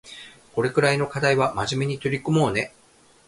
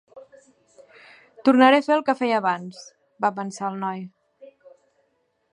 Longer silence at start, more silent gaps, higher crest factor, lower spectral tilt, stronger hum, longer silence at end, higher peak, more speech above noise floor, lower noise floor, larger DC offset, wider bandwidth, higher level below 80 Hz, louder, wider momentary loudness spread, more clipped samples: about the same, 0.05 s vs 0.15 s; neither; about the same, 20 dB vs 20 dB; about the same, -5.5 dB/octave vs -5 dB/octave; neither; second, 0.6 s vs 1.1 s; about the same, -4 dBFS vs -4 dBFS; second, 22 dB vs 49 dB; second, -44 dBFS vs -70 dBFS; neither; about the same, 11.5 kHz vs 10.5 kHz; first, -54 dBFS vs -80 dBFS; about the same, -23 LUFS vs -21 LUFS; second, 12 LU vs 21 LU; neither